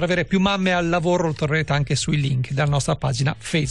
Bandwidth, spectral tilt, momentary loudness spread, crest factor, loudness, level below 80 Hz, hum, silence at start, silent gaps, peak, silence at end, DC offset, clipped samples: 11.5 kHz; -5.5 dB/octave; 4 LU; 12 dB; -21 LUFS; -42 dBFS; none; 0 s; none; -8 dBFS; 0 s; 0.5%; under 0.1%